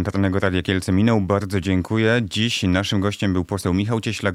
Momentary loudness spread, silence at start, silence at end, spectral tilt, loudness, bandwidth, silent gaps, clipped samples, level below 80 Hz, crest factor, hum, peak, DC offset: 4 LU; 0 s; 0 s; -6 dB/octave; -20 LUFS; 14.5 kHz; none; under 0.1%; -46 dBFS; 16 dB; none; -4 dBFS; under 0.1%